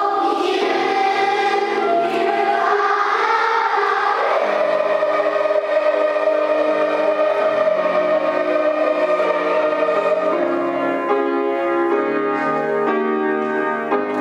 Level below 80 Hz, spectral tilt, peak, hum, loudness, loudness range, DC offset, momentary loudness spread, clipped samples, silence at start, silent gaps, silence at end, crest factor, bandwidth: -76 dBFS; -4.5 dB/octave; -4 dBFS; none; -18 LUFS; 2 LU; under 0.1%; 3 LU; under 0.1%; 0 s; none; 0 s; 12 dB; 10.5 kHz